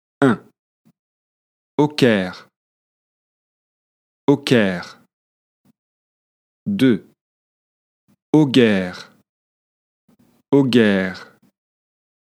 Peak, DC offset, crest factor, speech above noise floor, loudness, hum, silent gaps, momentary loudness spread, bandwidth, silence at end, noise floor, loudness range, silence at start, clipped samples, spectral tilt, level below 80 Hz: 0 dBFS; under 0.1%; 20 dB; over 74 dB; -18 LUFS; none; 0.59-0.85 s, 0.99-1.78 s, 2.56-4.27 s, 5.13-5.64 s, 5.79-6.66 s, 7.21-8.08 s, 8.22-8.33 s, 9.29-10.08 s; 15 LU; 14.5 kHz; 1.05 s; under -90 dBFS; 5 LU; 0.2 s; under 0.1%; -6.5 dB/octave; -68 dBFS